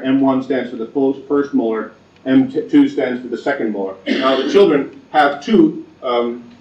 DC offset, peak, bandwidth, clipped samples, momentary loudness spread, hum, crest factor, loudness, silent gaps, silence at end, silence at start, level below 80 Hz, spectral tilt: under 0.1%; -2 dBFS; 7.6 kHz; under 0.1%; 9 LU; none; 14 dB; -16 LUFS; none; 0.2 s; 0 s; -62 dBFS; -6.5 dB/octave